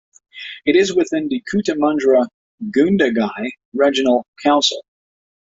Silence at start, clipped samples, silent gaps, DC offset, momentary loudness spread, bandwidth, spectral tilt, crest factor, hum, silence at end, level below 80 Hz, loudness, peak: 0.35 s; under 0.1%; 2.34-2.58 s, 3.65-3.72 s, 4.28-4.33 s; under 0.1%; 12 LU; 7.8 kHz; -4.5 dB/octave; 16 dB; none; 0.7 s; -58 dBFS; -17 LUFS; -2 dBFS